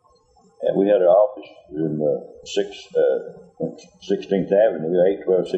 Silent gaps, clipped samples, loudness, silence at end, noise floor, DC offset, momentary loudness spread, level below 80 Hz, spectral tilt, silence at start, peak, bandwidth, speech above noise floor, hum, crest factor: none; under 0.1%; -21 LUFS; 0 s; -57 dBFS; under 0.1%; 14 LU; -62 dBFS; -6.5 dB/octave; 0.6 s; -4 dBFS; 8.2 kHz; 36 dB; none; 16 dB